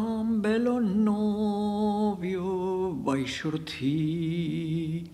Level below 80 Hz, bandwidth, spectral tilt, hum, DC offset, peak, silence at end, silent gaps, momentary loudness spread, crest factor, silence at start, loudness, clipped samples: -56 dBFS; 12 kHz; -7 dB/octave; none; under 0.1%; -14 dBFS; 0 s; none; 5 LU; 14 dB; 0 s; -28 LUFS; under 0.1%